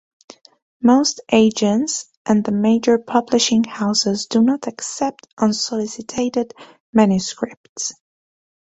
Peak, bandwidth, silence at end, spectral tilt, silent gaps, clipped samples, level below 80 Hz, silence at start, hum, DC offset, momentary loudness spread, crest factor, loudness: -2 dBFS; 8.2 kHz; 0.8 s; -4 dB/octave; 2.17-2.25 s, 5.33-5.37 s, 6.80-6.93 s, 7.57-7.76 s; under 0.1%; -58 dBFS; 0.8 s; none; under 0.1%; 11 LU; 16 dB; -18 LUFS